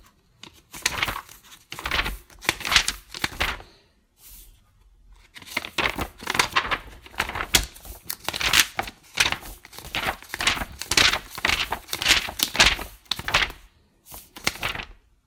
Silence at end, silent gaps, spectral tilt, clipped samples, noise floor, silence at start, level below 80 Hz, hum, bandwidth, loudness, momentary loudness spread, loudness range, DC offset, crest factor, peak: 0.35 s; none; -1 dB/octave; under 0.1%; -59 dBFS; 0.75 s; -42 dBFS; none; 19 kHz; -23 LUFS; 19 LU; 7 LU; under 0.1%; 28 dB; 0 dBFS